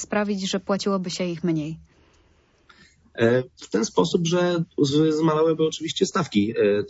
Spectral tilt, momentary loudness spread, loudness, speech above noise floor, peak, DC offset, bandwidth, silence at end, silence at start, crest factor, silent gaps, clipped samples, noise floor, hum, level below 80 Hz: -5.5 dB/octave; 7 LU; -23 LUFS; 38 dB; -6 dBFS; under 0.1%; 8 kHz; 0 s; 0 s; 18 dB; none; under 0.1%; -60 dBFS; none; -60 dBFS